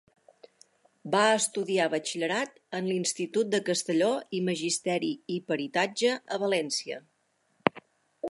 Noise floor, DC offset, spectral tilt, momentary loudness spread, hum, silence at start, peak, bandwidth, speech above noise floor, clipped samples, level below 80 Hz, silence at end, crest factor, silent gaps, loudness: -71 dBFS; under 0.1%; -3.5 dB/octave; 7 LU; none; 1.05 s; -2 dBFS; 11.5 kHz; 43 dB; under 0.1%; -78 dBFS; 0 s; 28 dB; none; -28 LUFS